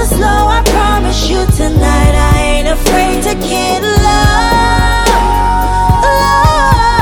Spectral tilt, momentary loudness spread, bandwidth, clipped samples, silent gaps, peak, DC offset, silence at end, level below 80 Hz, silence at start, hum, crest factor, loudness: -4.5 dB/octave; 4 LU; 18.5 kHz; 0.3%; none; 0 dBFS; under 0.1%; 0 s; -14 dBFS; 0 s; none; 8 dB; -10 LUFS